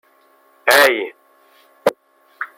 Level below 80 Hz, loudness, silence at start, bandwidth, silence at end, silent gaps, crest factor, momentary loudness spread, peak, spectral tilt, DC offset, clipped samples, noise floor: -64 dBFS; -16 LUFS; 0.65 s; 16.5 kHz; 0.1 s; none; 20 dB; 18 LU; 0 dBFS; -1 dB/octave; under 0.1%; under 0.1%; -55 dBFS